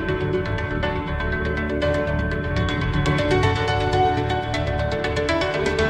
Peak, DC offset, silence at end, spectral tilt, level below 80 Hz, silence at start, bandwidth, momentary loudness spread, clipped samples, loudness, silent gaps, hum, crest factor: -8 dBFS; under 0.1%; 0 s; -6 dB/octave; -32 dBFS; 0 s; 10.5 kHz; 5 LU; under 0.1%; -22 LUFS; none; none; 14 dB